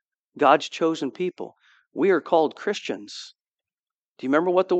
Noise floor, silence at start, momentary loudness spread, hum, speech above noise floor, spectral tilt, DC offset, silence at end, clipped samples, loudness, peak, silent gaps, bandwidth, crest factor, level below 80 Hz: under -90 dBFS; 0.35 s; 19 LU; none; over 67 dB; -5 dB/octave; under 0.1%; 0 s; under 0.1%; -23 LUFS; -2 dBFS; 3.41-3.45 s, 3.91-4.15 s; 8.4 kHz; 22 dB; -84 dBFS